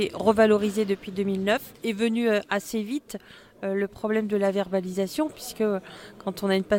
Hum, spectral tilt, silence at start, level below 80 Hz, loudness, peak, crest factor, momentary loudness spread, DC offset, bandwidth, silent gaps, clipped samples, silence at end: none; -5.5 dB/octave; 0 s; -58 dBFS; -26 LUFS; -6 dBFS; 18 dB; 12 LU; under 0.1%; 17 kHz; none; under 0.1%; 0 s